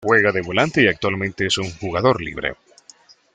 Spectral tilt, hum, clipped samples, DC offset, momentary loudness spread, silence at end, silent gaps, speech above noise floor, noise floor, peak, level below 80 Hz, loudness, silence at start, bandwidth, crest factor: -4.5 dB/octave; none; under 0.1%; under 0.1%; 9 LU; 0.8 s; none; 31 dB; -50 dBFS; -2 dBFS; -50 dBFS; -19 LUFS; 0 s; 9.6 kHz; 18 dB